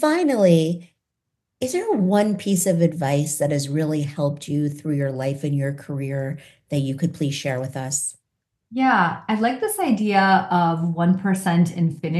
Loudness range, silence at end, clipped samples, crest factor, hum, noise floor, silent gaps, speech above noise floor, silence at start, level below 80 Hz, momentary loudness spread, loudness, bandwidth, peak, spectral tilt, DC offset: 5 LU; 0 s; under 0.1%; 18 dB; none; -80 dBFS; none; 59 dB; 0 s; -66 dBFS; 10 LU; -21 LUFS; 12.5 kHz; -4 dBFS; -5.5 dB/octave; under 0.1%